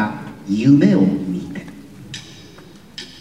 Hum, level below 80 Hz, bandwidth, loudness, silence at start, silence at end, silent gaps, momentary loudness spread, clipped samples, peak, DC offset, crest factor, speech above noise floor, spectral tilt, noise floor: none; -54 dBFS; 10 kHz; -16 LUFS; 0 s; 0.1 s; none; 25 LU; under 0.1%; -2 dBFS; 0.3%; 18 dB; 27 dB; -7.5 dB/octave; -42 dBFS